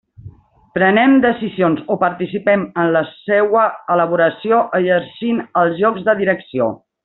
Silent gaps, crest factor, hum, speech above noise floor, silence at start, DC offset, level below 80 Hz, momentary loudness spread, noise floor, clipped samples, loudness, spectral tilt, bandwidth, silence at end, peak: none; 14 dB; none; 25 dB; 0.25 s; under 0.1%; -58 dBFS; 7 LU; -40 dBFS; under 0.1%; -16 LUFS; -4.5 dB/octave; 4.1 kHz; 0.3 s; -2 dBFS